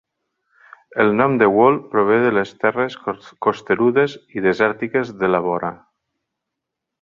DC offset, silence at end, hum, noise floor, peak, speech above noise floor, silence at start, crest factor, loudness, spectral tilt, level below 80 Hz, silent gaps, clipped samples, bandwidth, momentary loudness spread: under 0.1%; 1.25 s; none; -81 dBFS; -2 dBFS; 64 dB; 0.95 s; 18 dB; -18 LUFS; -7.5 dB/octave; -60 dBFS; none; under 0.1%; 7.2 kHz; 9 LU